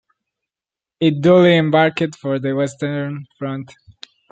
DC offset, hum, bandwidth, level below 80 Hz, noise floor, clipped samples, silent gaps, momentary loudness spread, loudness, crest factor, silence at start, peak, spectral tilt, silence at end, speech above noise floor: under 0.1%; none; 9 kHz; -62 dBFS; -89 dBFS; under 0.1%; none; 16 LU; -17 LUFS; 16 dB; 1 s; -2 dBFS; -7 dB/octave; 0.65 s; 73 dB